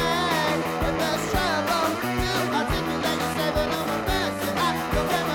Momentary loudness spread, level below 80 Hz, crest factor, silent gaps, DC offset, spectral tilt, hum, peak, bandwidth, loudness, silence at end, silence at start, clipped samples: 3 LU; -38 dBFS; 14 dB; none; under 0.1%; -4 dB/octave; none; -10 dBFS; 17.5 kHz; -24 LUFS; 0 s; 0 s; under 0.1%